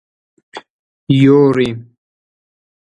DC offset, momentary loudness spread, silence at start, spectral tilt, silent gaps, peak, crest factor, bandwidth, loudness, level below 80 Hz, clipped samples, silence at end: under 0.1%; 26 LU; 0.55 s; -8.5 dB/octave; 0.70-1.07 s; 0 dBFS; 16 dB; 8.6 kHz; -12 LUFS; -54 dBFS; under 0.1%; 1.15 s